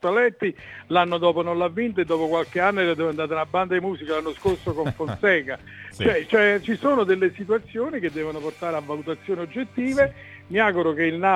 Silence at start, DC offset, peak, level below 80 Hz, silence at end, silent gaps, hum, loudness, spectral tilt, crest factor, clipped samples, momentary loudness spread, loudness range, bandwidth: 0.05 s; under 0.1%; -4 dBFS; -54 dBFS; 0 s; none; none; -23 LUFS; -6.5 dB/octave; 18 dB; under 0.1%; 9 LU; 3 LU; 12.5 kHz